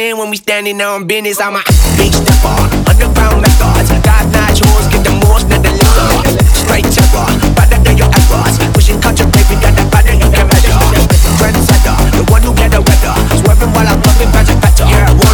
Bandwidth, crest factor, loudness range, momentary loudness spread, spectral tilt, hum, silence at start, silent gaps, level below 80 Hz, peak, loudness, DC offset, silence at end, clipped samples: over 20 kHz; 6 dB; 1 LU; 3 LU; -5 dB/octave; none; 0 s; none; -10 dBFS; 0 dBFS; -9 LUFS; under 0.1%; 0 s; 1%